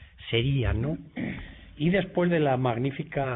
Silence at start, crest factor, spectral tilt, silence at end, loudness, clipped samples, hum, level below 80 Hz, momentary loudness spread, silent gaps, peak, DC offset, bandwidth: 0 s; 16 dB; -11 dB/octave; 0 s; -27 LUFS; under 0.1%; none; -42 dBFS; 11 LU; none; -12 dBFS; under 0.1%; 4 kHz